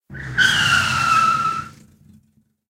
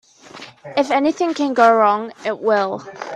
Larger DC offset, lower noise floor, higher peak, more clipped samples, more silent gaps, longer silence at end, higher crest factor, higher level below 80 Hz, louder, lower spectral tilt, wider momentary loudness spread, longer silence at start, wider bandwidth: neither; first, -60 dBFS vs -40 dBFS; about the same, -2 dBFS vs 0 dBFS; neither; neither; first, 1 s vs 0 s; about the same, 18 dB vs 18 dB; first, -48 dBFS vs -66 dBFS; about the same, -16 LUFS vs -17 LUFS; second, -1.5 dB/octave vs -4.5 dB/octave; second, 10 LU vs 19 LU; second, 0.1 s vs 0.35 s; first, 16 kHz vs 10 kHz